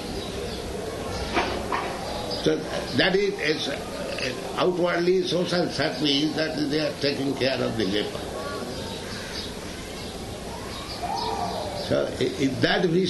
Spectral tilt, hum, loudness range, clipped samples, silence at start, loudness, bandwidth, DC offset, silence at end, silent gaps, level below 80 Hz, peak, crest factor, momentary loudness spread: -4.5 dB/octave; none; 7 LU; under 0.1%; 0 s; -26 LUFS; 12 kHz; under 0.1%; 0 s; none; -46 dBFS; -6 dBFS; 20 dB; 11 LU